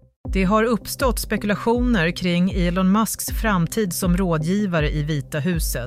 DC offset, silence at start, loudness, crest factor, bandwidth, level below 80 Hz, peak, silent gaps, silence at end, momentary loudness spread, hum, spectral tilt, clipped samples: under 0.1%; 0.25 s; -21 LUFS; 14 dB; 16 kHz; -30 dBFS; -6 dBFS; none; 0 s; 5 LU; none; -5.5 dB/octave; under 0.1%